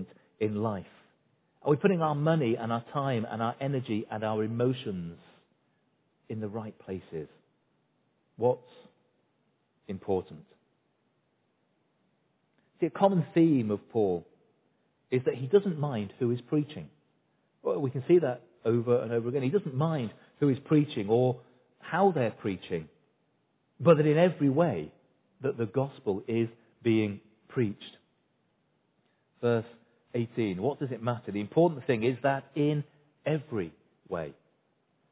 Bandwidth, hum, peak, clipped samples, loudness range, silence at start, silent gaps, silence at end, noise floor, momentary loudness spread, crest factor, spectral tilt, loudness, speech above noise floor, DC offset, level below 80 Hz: 4 kHz; none; -8 dBFS; under 0.1%; 9 LU; 0 s; none; 0.8 s; -74 dBFS; 14 LU; 22 dB; -7 dB/octave; -30 LUFS; 46 dB; under 0.1%; -66 dBFS